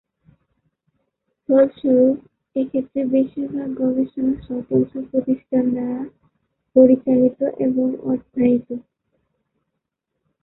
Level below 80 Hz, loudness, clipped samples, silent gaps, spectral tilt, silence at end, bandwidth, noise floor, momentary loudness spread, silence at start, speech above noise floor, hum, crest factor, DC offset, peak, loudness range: -58 dBFS; -19 LUFS; under 0.1%; none; -13 dB/octave; 1.6 s; 4 kHz; -78 dBFS; 11 LU; 1.5 s; 60 dB; none; 18 dB; under 0.1%; -2 dBFS; 3 LU